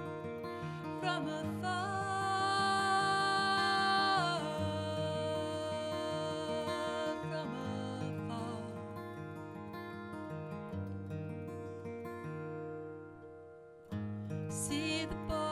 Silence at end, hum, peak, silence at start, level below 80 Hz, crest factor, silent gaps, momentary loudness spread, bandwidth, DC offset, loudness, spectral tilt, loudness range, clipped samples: 0 s; none; -20 dBFS; 0 s; -64 dBFS; 16 dB; none; 15 LU; 14.5 kHz; under 0.1%; -37 LUFS; -4.5 dB/octave; 12 LU; under 0.1%